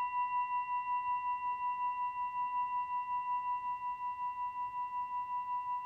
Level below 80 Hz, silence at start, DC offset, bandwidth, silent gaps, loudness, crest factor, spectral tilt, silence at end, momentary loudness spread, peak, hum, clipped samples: -74 dBFS; 0 s; under 0.1%; 4.5 kHz; none; -37 LUFS; 8 dB; -3 dB/octave; 0 s; 4 LU; -28 dBFS; none; under 0.1%